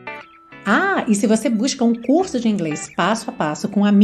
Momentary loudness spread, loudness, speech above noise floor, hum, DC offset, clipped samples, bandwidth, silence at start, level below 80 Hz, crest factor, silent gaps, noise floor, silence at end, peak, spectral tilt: 7 LU; -19 LUFS; 23 dB; none; under 0.1%; under 0.1%; 13 kHz; 0 s; -58 dBFS; 16 dB; none; -40 dBFS; 0 s; -2 dBFS; -5 dB/octave